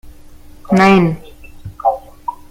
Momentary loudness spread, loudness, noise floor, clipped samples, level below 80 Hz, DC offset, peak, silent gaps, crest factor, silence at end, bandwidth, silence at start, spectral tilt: 22 LU; -14 LUFS; -37 dBFS; under 0.1%; -40 dBFS; under 0.1%; 0 dBFS; none; 16 dB; 0.15 s; 12 kHz; 0.05 s; -7 dB/octave